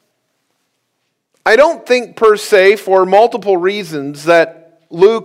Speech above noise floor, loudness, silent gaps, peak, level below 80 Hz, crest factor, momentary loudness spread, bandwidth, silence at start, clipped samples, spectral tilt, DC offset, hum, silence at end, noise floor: 58 dB; -12 LUFS; none; 0 dBFS; -56 dBFS; 12 dB; 10 LU; 15.5 kHz; 1.45 s; 0.4%; -4.5 dB/octave; under 0.1%; none; 0 s; -68 dBFS